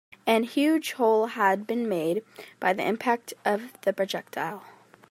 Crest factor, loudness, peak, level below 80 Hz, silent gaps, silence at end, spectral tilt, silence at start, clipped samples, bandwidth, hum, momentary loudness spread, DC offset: 20 dB; -26 LUFS; -8 dBFS; -80 dBFS; none; 0.4 s; -4.5 dB/octave; 0.25 s; under 0.1%; 16 kHz; none; 10 LU; under 0.1%